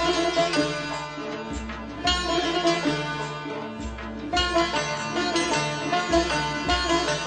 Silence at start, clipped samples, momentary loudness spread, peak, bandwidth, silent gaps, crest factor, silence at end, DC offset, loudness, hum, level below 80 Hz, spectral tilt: 0 s; under 0.1%; 10 LU; -10 dBFS; 9.8 kHz; none; 16 dB; 0 s; under 0.1%; -25 LUFS; none; -40 dBFS; -3.5 dB/octave